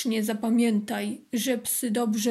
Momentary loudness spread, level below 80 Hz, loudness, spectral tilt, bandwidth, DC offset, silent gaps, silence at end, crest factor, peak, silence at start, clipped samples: 7 LU; -74 dBFS; -26 LUFS; -4 dB/octave; 15.5 kHz; under 0.1%; none; 0 s; 12 dB; -14 dBFS; 0 s; under 0.1%